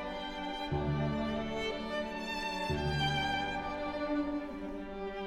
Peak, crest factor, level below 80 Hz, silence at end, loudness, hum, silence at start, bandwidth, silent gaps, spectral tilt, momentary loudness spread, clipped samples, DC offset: -20 dBFS; 16 dB; -48 dBFS; 0 s; -35 LUFS; none; 0 s; 15 kHz; none; -5.5 dB/octave; 8 LU; under 0.1%; under 0.1%